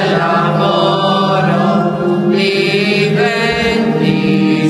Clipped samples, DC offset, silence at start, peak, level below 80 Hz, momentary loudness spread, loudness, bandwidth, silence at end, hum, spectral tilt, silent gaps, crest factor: under 0.1%; under 0.1%; 0 s; -2 dBFS; -44 dBFS; 1 LU; -12 LUFS; 12.5 kHz; 0 s; none; -6.5 dB/octave; none; 10 dB